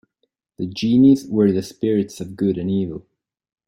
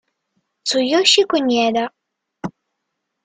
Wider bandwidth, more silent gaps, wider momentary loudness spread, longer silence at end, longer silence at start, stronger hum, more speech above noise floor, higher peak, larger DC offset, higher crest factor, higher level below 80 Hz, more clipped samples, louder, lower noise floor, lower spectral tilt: first, 14.5 kHz vs 9.6 kHz; neither; second, 15 LU vs 20 LU; about the same, 0.65 s vs 0.75 s; about the same, 0.6 s vs 0.65 s; neither; second, 54 dB vs 60 dB; second, -4 dBFS vs 0 dBFS; neither; about the same, 16 dB vs 20 dB; first, -56 dBFS vs -64 dBFS; neither; second, -19 LUFS vs -16 LUFS; second, -72 dBFS vs -76 dBFS; first, -7.5 dB/octave vs -2.5 dB/octave